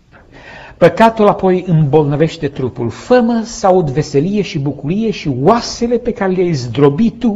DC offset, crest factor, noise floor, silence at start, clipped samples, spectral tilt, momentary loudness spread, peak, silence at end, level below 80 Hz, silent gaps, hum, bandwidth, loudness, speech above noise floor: under 0.1%; 14 dB; -39 dBFS; 0.35 s; 0.1%; -7 dB/octave; 9 LU; 0 dBFS; 0 s; -40 dBFS; none; none; 8.2 kHz; -13 LUFS; 26 dB